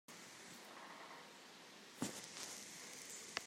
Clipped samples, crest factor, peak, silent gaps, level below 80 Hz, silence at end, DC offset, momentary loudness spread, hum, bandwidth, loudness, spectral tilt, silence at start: under 0.1%; 32 dB; -22 dBFS; none; -90 dBFS; 0 s; under 0.1%; 10 LU; none; 16 kHz; -51 LUFS; -2 dB/octave; 0.1 s